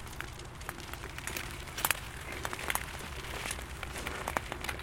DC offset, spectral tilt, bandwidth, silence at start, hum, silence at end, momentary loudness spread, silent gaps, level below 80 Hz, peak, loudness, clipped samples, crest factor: under 0.1%; -2.5 dB/octave; 17 kHz; 0 s; none; 0 s; 10 LU; none; -48 dBFS; -6 dBFS; -37 LUFS; under 0.1%; 32 dB